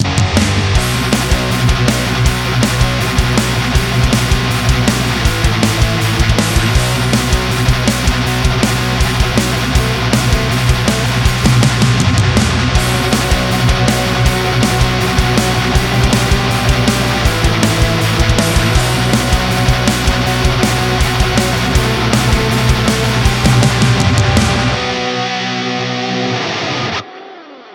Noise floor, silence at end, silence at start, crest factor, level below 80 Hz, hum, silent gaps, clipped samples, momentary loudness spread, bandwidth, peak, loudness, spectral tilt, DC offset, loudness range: -34 dBFS; 0 s; 0 s; 12 dB; -20 dBFS; none; none; under 0.1%; 3 LU; 18.5 kHz; 0 dBFS; -13 LUFS; -4.5 dB/octave; under 0.1%; 1 LU